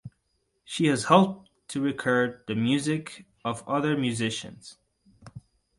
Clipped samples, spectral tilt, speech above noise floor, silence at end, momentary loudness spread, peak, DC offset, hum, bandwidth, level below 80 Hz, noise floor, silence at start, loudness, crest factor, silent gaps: under 0.1%; -5 dB/octave; 49 dB; 0.4 s; 16 LU; -4 dBFS; under 0.1%; none; 11.5 kHz; -64 dBFS; -74 dBFS; 0.05 s; -26 LUFS; 24 dB; none